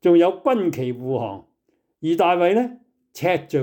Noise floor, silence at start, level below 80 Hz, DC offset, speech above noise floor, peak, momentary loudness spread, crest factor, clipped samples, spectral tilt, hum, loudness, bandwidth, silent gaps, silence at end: -69 dBFS; 0.05 s; -68 dBFS; under 0.1%; 50 dB; -6 dBFS; 13 LU; 14 dB; under 0.1%; -7 dB/octave; none; -21 LUFS; 18 kHz; none; 0 s